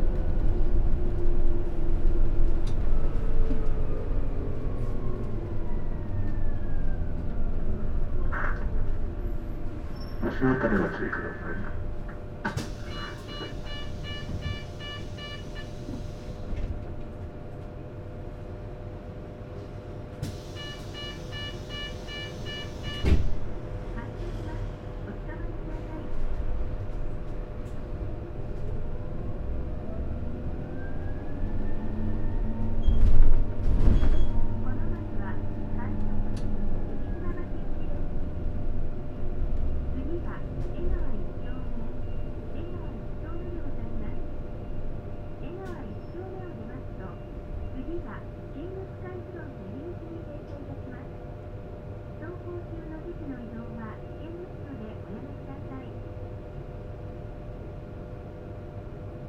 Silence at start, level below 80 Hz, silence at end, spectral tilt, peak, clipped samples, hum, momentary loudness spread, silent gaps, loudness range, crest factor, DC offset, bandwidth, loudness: 0 s; -28 dBFS; 0 s; -7.5 dB/octave; -4 dBFS; under 0.1%; none; 10 LU; none; 9 LU; 22 dB; under 0.1%; 5.8 kHz; -35 LUFS